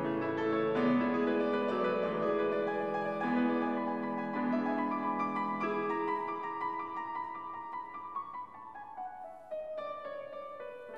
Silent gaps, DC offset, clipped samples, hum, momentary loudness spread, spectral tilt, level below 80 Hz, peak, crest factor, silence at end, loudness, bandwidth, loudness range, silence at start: none; under 0.1%; under 0.1%; none; 13 LU; -7.5 dB/octave; -80 dBFS; -20 dBFS; 14 dB; 0 s; -34 LUFS; 6.6 kHz; 10 LU; 0 s